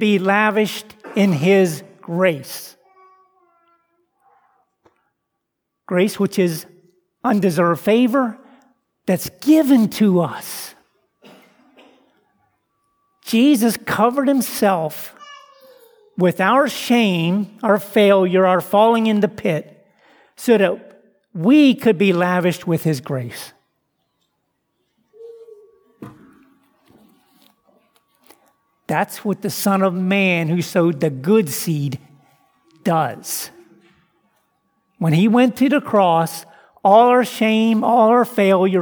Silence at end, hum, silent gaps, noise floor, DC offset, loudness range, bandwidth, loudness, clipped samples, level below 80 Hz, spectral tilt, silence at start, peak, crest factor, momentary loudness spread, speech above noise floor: 0 s; none; none; -77 dBFS; under 0.1%; 11 LU; over 20 kHz; -17 LUFS; under 0.1%; -68 dBFS; -6 dB/octave; 0 s; -2 dBFS; 18 dB; 13 LU; 61 dB